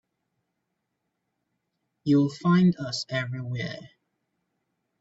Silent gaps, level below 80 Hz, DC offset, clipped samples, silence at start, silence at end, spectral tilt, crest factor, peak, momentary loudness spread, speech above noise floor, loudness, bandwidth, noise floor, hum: none; -68 dBFS; under 0.1%; under 0.1%; 2.05 s; 1.15 s; -6.5 dB/octave; 18 dB; -12 dBFS; 14 LU; 56 dB; -25 LUFS; 8 kHz; -80 dBFS; none